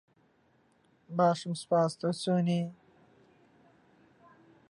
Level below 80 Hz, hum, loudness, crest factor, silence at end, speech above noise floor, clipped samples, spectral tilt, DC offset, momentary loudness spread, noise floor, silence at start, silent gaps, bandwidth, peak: -78 dBFS; none; -30 LUFS; 18 dB; 2 s; 39 dB; under 0.1%; -6.5 dB/octave; under 0.1%; 8 LU; -68 dBFS; 1.1 s; none; 11 kHz; -14 dBFS